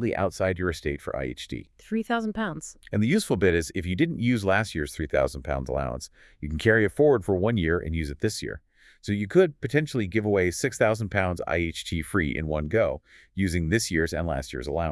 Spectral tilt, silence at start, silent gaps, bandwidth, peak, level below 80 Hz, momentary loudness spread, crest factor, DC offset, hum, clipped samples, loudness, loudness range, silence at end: -5.5 dB/octave; 0 s; none; 12 kHz; -6 dBFS; -44 dBFS; 11 LU; 20 dB; under 0.1%; none; under 0.1%; -26 LUFS; 2 LU; 0 s